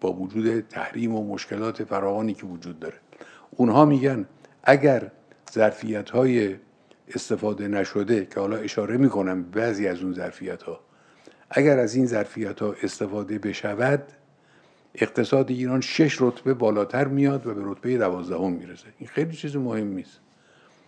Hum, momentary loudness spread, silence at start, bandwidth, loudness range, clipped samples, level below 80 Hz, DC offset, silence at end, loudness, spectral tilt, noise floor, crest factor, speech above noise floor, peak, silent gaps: none; 15 LU; 0 s; 9.6 kHz; 5 LU; under 0.1%; -72 dBFS; under 0.1%; 0.85 s; -24 LUFS; -6.5 dB/octave; -58 dBFS; 24 dB; 34 dB; -2 dBFS; none